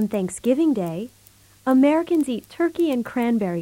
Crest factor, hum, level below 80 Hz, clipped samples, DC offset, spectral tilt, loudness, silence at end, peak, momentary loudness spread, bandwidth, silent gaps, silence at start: 14 dB; none; -60 dBFS; under 0.1%; under 0.1%; -6.5 dB/octave; -22 LUFS; 0 s; -8 dBFS; 12 LU; 16.5 kHz; none; 0 s